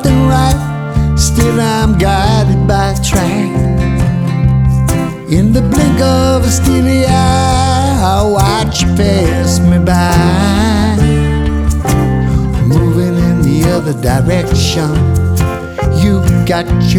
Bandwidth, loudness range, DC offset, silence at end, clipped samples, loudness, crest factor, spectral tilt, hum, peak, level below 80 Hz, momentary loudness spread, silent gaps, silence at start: 19 kHz; 1 LU; under 0.1%; 0 s; under 0.1%; -11 LUFS; 10 dB; -6 dB/octave; none; 0 dBFS; -18 dBFS; 4 LU; none; 0 s